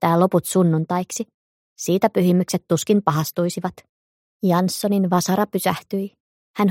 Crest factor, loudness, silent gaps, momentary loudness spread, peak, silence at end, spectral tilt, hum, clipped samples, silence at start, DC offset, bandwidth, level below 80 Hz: 18 dB; -21 LUFS; 1.34-1.76 s, 3.89-4.40 s, 6.20-6.54 s; 11 LU; -2 dBFS; 0 s; -6 dB/octave; none; under 0.1%; 0 s; under 0.1%; 16.5 kHz; -64 dBFS